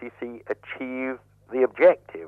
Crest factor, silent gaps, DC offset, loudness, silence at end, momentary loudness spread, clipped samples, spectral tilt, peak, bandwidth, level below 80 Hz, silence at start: 20 dB; none; under 0.1%; -24 LUFS; 0 s; 18 LU; under 0.1%; -7.5 dB/octave; -6 dBFS; 4.2 kHz; -68 dBFS; 0 s